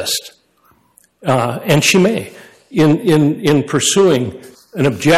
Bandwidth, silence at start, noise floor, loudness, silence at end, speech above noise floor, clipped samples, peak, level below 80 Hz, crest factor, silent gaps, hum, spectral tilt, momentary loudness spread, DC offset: 15.5 kHz; 0 s; -55 dBFS; -14 LUFS; 0 s; 41 dB; under 0.1%; -2 dBFS; -50 dBFS; 14 dB; none; none; -4.5 dB/octave; 12 LU; under 0.1%